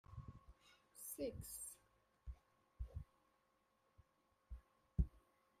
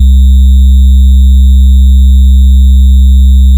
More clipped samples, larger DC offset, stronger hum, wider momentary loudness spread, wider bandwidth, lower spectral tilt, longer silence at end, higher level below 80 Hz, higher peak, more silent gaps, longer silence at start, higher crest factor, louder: neither; neither; neither; first, 20 LU vs 0 LU; first, 15.5 kHz vs 11.5 kHz; second, -6 dB/octave vs -8 dB/octave; first, 0.4 s vs 0 s; second, -56 dBFS vs -2 dBFS; second, -24 dBFS vs 0 dBFS; neither; about the same, 0.1 s vs 0 s; first, 28 dB vs 2 dB; second, -51 LUFS vs -5 LUFS